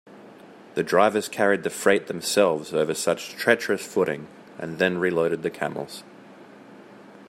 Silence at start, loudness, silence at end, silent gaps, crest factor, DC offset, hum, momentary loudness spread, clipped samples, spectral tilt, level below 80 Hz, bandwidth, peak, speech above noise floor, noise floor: 0.05 s; -24 LUFS; 0.05 s; none; 22 dB; under 0.1%; none; 14 LU; under 0.1%; -4 dB/octave; -70 dBFS; 16 kHz; -2 dBFS; 23 dB; -47 dBFS